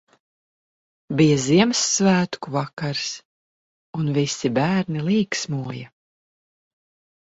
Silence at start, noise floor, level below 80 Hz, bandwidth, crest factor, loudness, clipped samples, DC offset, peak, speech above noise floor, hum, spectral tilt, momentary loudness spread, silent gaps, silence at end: 1.1 s; under -90 dBFS; -60 dBFS; 8 kHz; 20 dB; -21 LUFS; under 0.1%; under 0.1%; -4 dBFS; over 69 dB; none; -4.5 dB/octave; 12 LU; 2.73-2.77 s, 3.25-3.93 s; 1.35 s